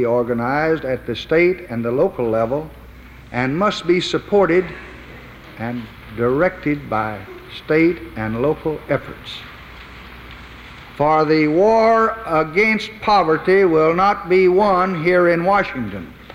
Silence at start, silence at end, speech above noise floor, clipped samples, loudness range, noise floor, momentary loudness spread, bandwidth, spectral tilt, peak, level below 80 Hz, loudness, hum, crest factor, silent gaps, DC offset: 0 s; 0 s; 22 dB; under 0.1%; 7 LU; -40 dBFS; 22 LU; 15.5 kHz; -6.5 dB/octave; -4 dBFS; -44 dBFS; -17 LUFS; none; 14 dB; none; under 0.1%